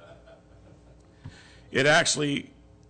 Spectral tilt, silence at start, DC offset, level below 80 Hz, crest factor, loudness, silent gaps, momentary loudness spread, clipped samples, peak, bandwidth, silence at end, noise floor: -3 dB/octave; 0.1 s; under 0.1%; -58 dBFS; 16 dB; -23 LUFS; none; 13 LU; under 0.1%; -12 dBFS; 9.4 kHz; 0.45 s; -54 dBFS